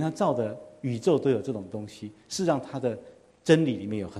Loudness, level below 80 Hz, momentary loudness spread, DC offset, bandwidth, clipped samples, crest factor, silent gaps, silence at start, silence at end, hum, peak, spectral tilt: -27 LUFS; -66 dBFS; 15 LU; under 0.1%; 12.5 kHz; under 0.1%; 22 dB; none; 0 s; 0 s; none; -6 dBFS; -6 dB/octave